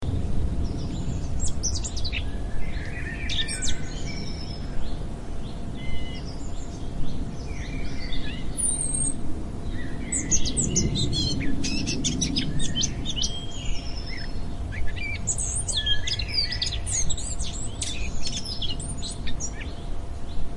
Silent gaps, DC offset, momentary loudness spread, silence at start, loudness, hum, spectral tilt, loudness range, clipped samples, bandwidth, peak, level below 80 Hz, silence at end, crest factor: none; under 0.1%; 11 LU; 0 s; -29 LUFS; none; -3 dB/octave; 9 LU; under 0.1%; 11 kHz; -8 dBFS; -32 dBFS; 0 s; 18 dB